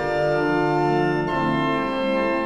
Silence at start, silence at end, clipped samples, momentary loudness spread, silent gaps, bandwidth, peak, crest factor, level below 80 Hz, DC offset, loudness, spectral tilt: 0 s; 0 s; under 0.1%; 2 LU; none; 11.5 kHz; -8 dBFS; 12 dB; -46 dBFS; under 0.1%; -21 LUFS; -7 dB/octave